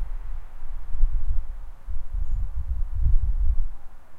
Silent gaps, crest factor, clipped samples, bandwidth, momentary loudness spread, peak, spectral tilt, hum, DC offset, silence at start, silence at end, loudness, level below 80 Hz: none; 14 dB; under 0.1%; 1.6 kHz; 15 LU; -6 dBFS; -8.5 dB/octave; none; under 0.1%; 0 s; 0 s; -32 LUFS; -24 dBFS